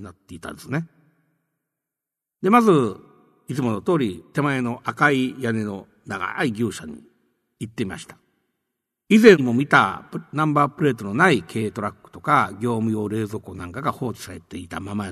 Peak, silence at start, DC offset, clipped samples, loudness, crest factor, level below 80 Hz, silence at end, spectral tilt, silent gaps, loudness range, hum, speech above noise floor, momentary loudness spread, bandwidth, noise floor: 0 dBFS; 0 s; under 0.1%; under 0.1%; -21 LUFS; 22 dB; -60 dBFS; 0 s; -6 dB/octave; none; 7 LU; none; 66 dB; 19 LU; 13.5 kHz; -87 dBFS